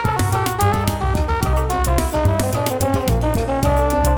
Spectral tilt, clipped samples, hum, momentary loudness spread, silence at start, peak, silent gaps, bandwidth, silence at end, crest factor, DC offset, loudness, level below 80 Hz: -5.5 dB/octave; under 0.1%; none; 2 LU; 0 s; -2 dBFS; none; 20 kHz; 0 s; 16 dB; under 0.1%; -19 LUFS; -24 dBFS